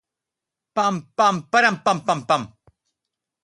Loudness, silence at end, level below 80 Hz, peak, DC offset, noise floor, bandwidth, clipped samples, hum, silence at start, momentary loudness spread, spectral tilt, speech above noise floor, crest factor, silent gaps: -20 LUFS; 0.95 s; -66 dBFS; -4 dBFS; under 0.1%; -86 dBFS; 11.5 kHz; under 0.1%; none; 0.75 s; 5 LU; -4 dB/octave; 66 dB; 20 dB; none